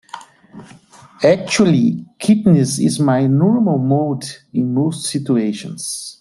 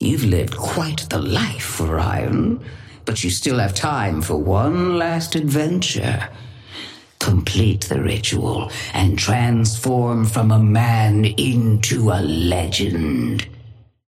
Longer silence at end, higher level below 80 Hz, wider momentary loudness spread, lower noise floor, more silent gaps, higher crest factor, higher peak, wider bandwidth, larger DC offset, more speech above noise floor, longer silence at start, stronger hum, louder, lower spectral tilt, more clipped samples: second, 0.1 s vs 0.35 s; second, -56 dBFS vs -38 dBFS; about the same, 11 LU vs 9 LU; about the same, -44 dBFS vs -43 dBFS; neither; about the same, 14 dB vs 14 dB; about the same, -2 dBFS vs -4 dBFS; second, 12.5 kHz vs 15.5 kHz; neither; about the same, 28 dB vs 25 dB; first, 0.15 s vs 0 s; neither; first, -16 LUFS vs -19 LUFS; about the same, -6 dB/octave vs -5 dB/octave; neither